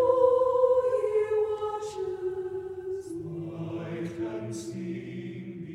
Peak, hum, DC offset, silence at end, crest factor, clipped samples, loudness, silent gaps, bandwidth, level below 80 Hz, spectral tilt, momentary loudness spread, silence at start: -10 dBFS; none; under 0.1%; 0 s; 18 dB; under 0.1%; -29 LUFS; none; 11 kHz; -64 dBFS; -7 dB/octave; 14 LU; 0 s